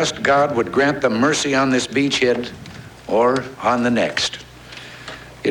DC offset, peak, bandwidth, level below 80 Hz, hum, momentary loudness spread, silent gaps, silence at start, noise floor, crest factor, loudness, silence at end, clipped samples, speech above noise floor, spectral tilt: under 0.1%; -4 dBFS; 17 kHz; -50 dBFS; none; 19 LU; none; 0 s; -38 dBFS; 14 dB; -18 LUFS; 0 s; under 0.1%; 20 dB; -4 dB/octave